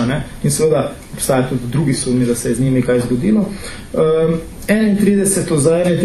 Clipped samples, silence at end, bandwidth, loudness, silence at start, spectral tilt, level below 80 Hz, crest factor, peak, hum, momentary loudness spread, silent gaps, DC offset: under 0.1%; 0 s; 14 kHz; -16 LUFS; 0 s; -5.5 dB/octave; -36 dBFS; 14 dB; 0 dBFS; none; 7 LU; none; under 0.1%